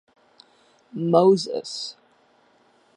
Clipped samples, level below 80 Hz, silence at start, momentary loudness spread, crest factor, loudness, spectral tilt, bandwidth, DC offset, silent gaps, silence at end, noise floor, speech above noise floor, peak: under 0.1%; -76 dBFS; 0.95 s; 17 LU; 22 dB; -21 LUFS; -6.5 dB/octave; 10.5 kHz; under 0.1%; none; 1.05 s; -60 dBFS; 39 dB; -2 dBFS